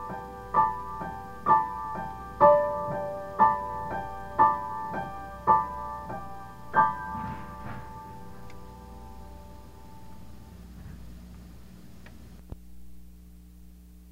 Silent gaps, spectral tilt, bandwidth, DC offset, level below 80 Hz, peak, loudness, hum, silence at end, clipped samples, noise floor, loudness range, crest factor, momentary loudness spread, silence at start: none; -7 dB/octave; 16 kHz; 0.3%; -50 dBFS; -8 dBFS; -27 LUFS; 60 Hz at -50 dBFS; 0 s; under 0.1%; -50 dBFS; 22 LU; 22 dB; 25 LU; 0 s